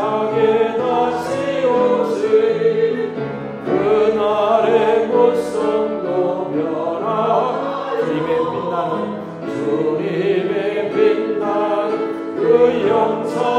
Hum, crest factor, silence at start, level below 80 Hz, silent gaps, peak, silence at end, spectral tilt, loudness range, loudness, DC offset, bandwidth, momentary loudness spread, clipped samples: none; 16 dB; 0 s; -60 dBFS; none; -2 dBFS; 0 s; -6.5 dB/octave; 3 LU; -18 LUFS; under 0.1%; 10 kHz; 7 LU; under 0.1%